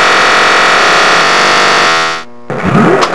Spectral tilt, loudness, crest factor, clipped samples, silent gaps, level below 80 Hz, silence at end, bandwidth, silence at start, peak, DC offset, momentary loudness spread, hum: -3 dB/octave; -6 LUFS; 8 dB; 1%; none; -42 dBFS; 0 s; 11 kHz; 0 s; 0 dBFS; 4%; 9 LU; none